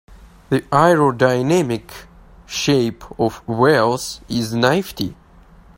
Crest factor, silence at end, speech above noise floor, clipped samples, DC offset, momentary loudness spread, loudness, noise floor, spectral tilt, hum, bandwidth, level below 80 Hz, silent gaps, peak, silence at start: 18 dB; 0.65 s; 29 dB; under 0.1%; under 0.1%; 13 LU; -18 LUFS; -46 dBFS; -5.5 dB/octave; none; 16.5 kHz; -46 dBFS; none; 0 dBFS; 0.1 s